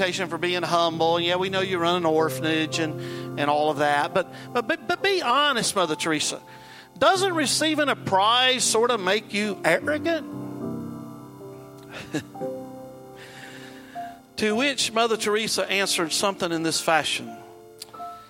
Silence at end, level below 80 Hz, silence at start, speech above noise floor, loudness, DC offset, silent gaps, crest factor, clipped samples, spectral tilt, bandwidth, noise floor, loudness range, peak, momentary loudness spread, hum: 0.05 s; -66 dBFS; 0 s; 21 dB; -23 LUFS; under 0.1%; none; 20 dB; under 0.1%; -3 dB/octave; 16.5 kHz; -44 dBFS; 11 LU; -4 dBFS; 20 LU; none